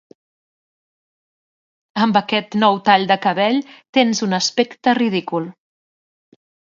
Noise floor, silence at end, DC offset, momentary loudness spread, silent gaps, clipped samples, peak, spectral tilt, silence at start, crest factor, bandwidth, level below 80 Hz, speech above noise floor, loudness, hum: under -90 dBFS; 1.15 s; under 0.1%; 9 LU; 3.89-3.93 s; under 0.1%; 0 dBFS; -4 dB/octave; 1.95 s; 20 dB; 7.6 kHz; -68 dBFS; over 73 dB; -17 LUFS; none